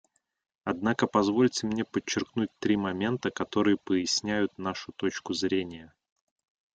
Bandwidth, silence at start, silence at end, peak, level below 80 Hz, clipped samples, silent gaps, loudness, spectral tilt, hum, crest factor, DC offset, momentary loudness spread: 9.2 kHz; 0.65 s; 0.9 s; -10 dBFS; -64 dBFS; under 0.1%; none; -29 LUFS; -4.5 dB/octave; none; 20 dB; under 0.1%; 8 LU